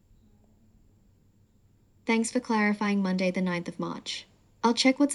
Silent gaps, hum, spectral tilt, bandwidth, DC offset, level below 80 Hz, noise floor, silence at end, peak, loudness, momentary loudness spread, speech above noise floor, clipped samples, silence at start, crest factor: none; none; -4.5 dB/octave; 11.5 kHz; under 0.1%; -66 dBFS; -63 dBFS; 0 s; -10 dBFS; -28 LUFS; 12 LU; 36 dB; under 0.1%; 2.05 s; 20 dB